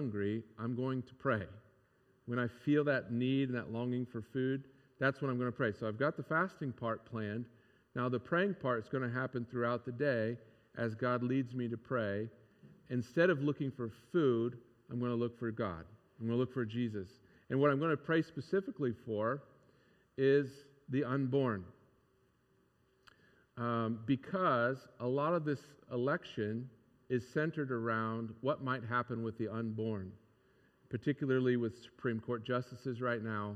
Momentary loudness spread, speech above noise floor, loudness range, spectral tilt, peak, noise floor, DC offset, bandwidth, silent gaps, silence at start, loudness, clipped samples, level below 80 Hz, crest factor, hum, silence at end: 10 LU; 37 dB; 2 LU; -8.5 dB/octave; -16 dBFS; -73 dBFS; under 0.1%; 9.4 kHz; none; 0 s; -37 LUFS; under 0.1%; -76 dBFS; 20 dB; none; 0 s